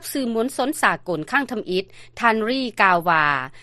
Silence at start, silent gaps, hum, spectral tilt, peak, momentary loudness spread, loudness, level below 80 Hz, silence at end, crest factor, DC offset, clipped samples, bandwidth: 0 s; none; none; -4 dB/octave; 0 dBFS; 9 LU; -20 LUFS; -56 dBFS; 0 s; 20 dB; under 0.1%; under 0.1%; 13 kHz